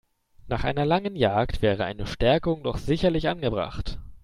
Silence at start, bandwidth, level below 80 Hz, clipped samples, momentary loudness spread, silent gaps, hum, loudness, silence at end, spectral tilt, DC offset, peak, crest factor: 0.45 s; 12.5 kHz; -38 dBFS; under 0.1%; 8 LU; none; none; -25 LUFS; 0.05 s; -7 dB/octave; under 0.1%; -8 dBFS; 18 dB